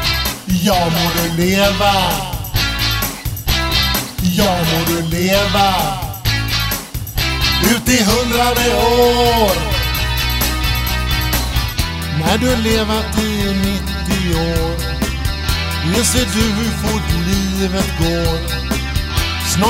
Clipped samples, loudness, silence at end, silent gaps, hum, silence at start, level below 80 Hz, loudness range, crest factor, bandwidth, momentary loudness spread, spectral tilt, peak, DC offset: under 0.1%; -16 LUFS; 0 s; none; none; 0 s; -24 dBFS; 3 LU; 16 dB; 16.5 kHz; 7 LU; -4 dB/octave; 0 dBFS; under 0.1%